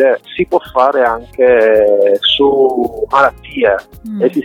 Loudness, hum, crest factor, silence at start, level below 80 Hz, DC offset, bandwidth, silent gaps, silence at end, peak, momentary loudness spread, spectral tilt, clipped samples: -12 LUFS; none; 12 dB; 0 s; -42 dBFS; under 0.1%; 15 kHz; none; 0 s; 0 dBFS; 7 LU; -5.5 dB/octave; under 0.1%